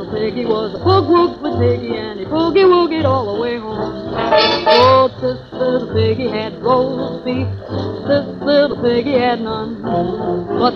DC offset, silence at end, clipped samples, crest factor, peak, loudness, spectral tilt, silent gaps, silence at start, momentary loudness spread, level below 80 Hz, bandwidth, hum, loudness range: under 0.1%; 0 s; under 0.1%; 16 dB; 0 dBFS; -16 LUFS; -7.5 dB/octave; none; 0 s; 11 LU; -44 dBFS; 6.6 kHz; none; 4 LU